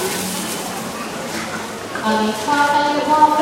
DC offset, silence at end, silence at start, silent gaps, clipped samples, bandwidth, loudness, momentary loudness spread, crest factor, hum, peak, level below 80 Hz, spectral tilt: under 0.1%; 0 s; 0 s; none; under 0.1%; 16 kHz; -19 LUFS; 11 LU; 18 dB; none; 0 dBFS; -54 dBFS; -3 dB/octave